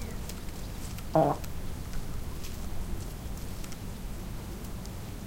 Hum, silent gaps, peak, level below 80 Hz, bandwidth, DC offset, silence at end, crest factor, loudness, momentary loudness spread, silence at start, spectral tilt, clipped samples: none; none; -10 dBFS; -40 dBFS; 17 kHz; under 0.1%; 0 s; 22 dB; -36 LUFS; 13 LU; 0 s; -6 dB/octave; under 0.1%